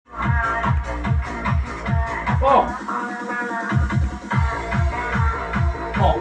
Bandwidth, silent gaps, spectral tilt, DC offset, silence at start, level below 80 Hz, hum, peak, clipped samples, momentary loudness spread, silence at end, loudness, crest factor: 9 kHz; none; -7 dB/octave; under 0.1%; 0.1 s; -28 dBFS; none; -2 dBFS; under 0.1%; 6 LU; 0 s; -22 LUFS; 18 dB